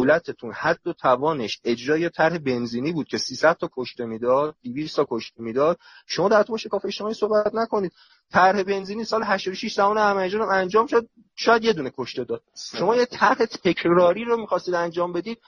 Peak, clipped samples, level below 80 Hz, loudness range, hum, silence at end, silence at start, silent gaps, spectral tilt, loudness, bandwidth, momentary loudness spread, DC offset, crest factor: -4 dBFS; under 0.1%; -62 dBFS; 2 LU; none; 0.1 s; 0 s; none; -5 dB/octave; -23 LUFS; 10 kHz; 11 LU; under 0.1%; 18 dB